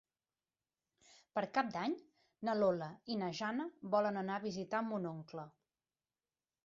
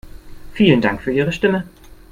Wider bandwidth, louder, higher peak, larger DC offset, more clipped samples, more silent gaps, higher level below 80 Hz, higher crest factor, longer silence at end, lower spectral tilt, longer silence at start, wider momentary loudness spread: second, 7.6 kHz vs 15 kHz; second, -39 LUFS vs -17 LUFS; second, -20 dBFS vs 0 dBFS; neither; neither; neither; second, -82 dBFS vs -42 dBFS; about the same, 20 dB vs 18 dB; first, 1.15 s vs 0.15 s; second, -4.5 dB/octave vs -7 dB/octave; first, 1.35 s vs 0.05 s; second, 11 LU vs 18 LU